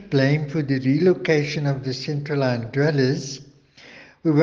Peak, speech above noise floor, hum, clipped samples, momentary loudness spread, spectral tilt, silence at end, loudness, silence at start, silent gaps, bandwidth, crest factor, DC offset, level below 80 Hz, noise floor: -4 dBFS; 27 dB; none; under 0.1%; 8 LU; -7 dB/octave; 0 s; -22 LUFS; 0 s; none; 7.4 kHz; 18 dB; under 0.1%; -58 dBFS; -48 dBFS